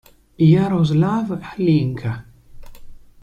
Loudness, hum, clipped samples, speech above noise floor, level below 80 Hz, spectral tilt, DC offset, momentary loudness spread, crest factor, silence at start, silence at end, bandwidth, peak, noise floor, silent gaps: -18 LUFS; none; under 0.1%; 20 dB; -46 dBFS; -9 dB/octave; under 0.1%; 12 LU; 16 dB; 0.4 s; 0.3 s; 7.2 kHz; -4 dBFS; -37 dBFS; none